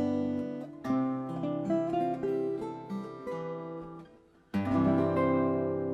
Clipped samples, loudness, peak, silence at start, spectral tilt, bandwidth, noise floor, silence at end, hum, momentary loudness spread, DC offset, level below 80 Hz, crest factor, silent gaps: under 0.1%; -32 LUFS; -16 dBFS; 0 s; -9 dB/octave; 7.8 kHz; -58 dBFS; 0 s; none; 12 LU; under 0.1%; -66 dBFS; 16 dB; none